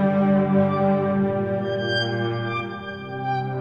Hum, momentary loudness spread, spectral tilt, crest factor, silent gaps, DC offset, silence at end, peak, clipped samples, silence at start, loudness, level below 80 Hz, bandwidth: none; 10 LU; -8 dB/octave; 14 dB; none; under 0.1%; 0 s; -8 dBFS; under 0.1%; 0 s; -23 LUFS; -60 dBFS; 6.8 kHz